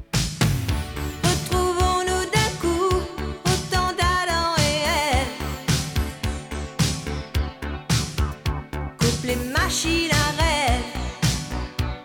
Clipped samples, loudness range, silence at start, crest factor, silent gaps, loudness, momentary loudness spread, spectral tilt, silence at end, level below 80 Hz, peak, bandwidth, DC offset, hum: under 0.1%; 4 LU; 0 s; 14 dB; none; -23 LUFS; 9 LU; -4 dB/octave; 0 s; -32 dBFS; -8 dBFS; over 20 kHz; under 0.1%; none